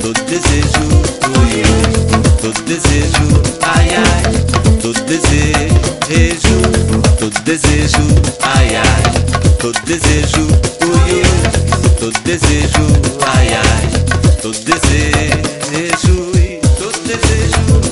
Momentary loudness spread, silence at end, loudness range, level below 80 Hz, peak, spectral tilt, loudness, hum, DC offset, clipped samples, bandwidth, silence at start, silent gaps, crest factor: 4 LU; 0 s; 1 LU; -16 dBFS; 0 dBFS; -4.5 dB/octave; -12 LUFS; none; 0.4%; under 0.1%; 11.5 kHz; 0 s; none; 10 dB